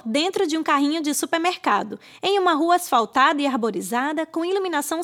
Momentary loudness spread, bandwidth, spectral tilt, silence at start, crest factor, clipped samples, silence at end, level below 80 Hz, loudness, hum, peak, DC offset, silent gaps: 6 LU; 18 kHz; -2.5 dB/octave; 0.05 s; 18 dB; under 0.1%; 0 s; -74 dBFS; -21 LUFS; none; -4 dBFS; under 0.1%; none